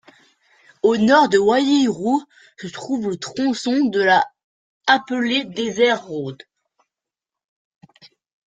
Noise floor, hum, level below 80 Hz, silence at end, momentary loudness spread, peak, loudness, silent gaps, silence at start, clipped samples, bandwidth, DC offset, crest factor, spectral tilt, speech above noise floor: -87 dBFS; none; -64 dBFS; 2.1 s; 14 LU; -2 dBFS; -19 LUFS; 4.44-4.81 s; 0.85 s; under 0.1%; 9.2 kHz; under 0.1%; 20 dB; -4.5 dB/octave; 69 dB